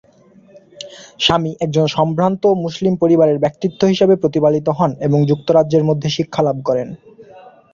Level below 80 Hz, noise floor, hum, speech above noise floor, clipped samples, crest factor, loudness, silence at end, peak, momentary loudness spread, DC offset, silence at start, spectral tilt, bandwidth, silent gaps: -52 dBFS; -48 dBFS; none; 33 dB; under 0.1%; 14 dB; -16 LUFS; 0.25 s; -2 dBFS; 7 LU; under 0.1%; 0.55 s; -6.5 dB/octave; 7.6 kHz; none